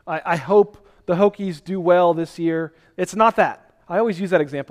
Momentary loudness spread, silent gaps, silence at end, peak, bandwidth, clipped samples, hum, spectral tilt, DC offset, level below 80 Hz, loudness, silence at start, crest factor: 10 LU; none; 0.05 s; -2 dBFS; 13.5 kHz; under 0.1%; none; -6.5 dB/octave; under 0.1%; -58 dBFS; -20 LUFS; 0.05 s; 18 dB